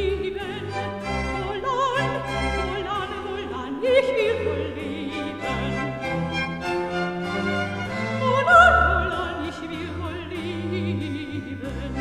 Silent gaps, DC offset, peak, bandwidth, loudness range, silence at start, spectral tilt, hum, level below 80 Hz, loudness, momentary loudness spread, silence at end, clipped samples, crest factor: none; under 0.1%; -2 dBFS; 13 kHz; 6 LU; 0 s; -6 dB/octave; none; -38 dBFS; -24 LUFS; 11 LU; 0 s; under 0.1%; 22 dB